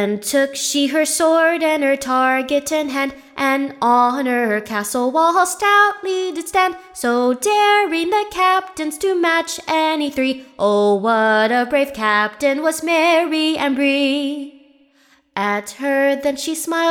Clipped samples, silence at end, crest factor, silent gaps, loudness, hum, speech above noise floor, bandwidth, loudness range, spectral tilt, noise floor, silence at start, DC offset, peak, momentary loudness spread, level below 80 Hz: under 0.1%; 0 s; 16 dB; none; -17 LUFS; none; 38 dB; 19 kHz; 2 LU; -2.5 dB/octave; -56 dBFS; 0 s; under 0.1%; -2 dBFS; 7 LU; -58 dBFS